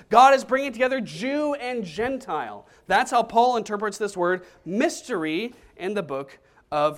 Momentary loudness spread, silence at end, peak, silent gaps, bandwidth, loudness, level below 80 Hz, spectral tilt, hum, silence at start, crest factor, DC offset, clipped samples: 12 LU; 0 s; -2 dBFS; none; 15.5 kHz; -24 LUFS; -60 dBFS; -4 dB/octave; none; 0.1 s; 22 dB; under 0.1%; under 0.1%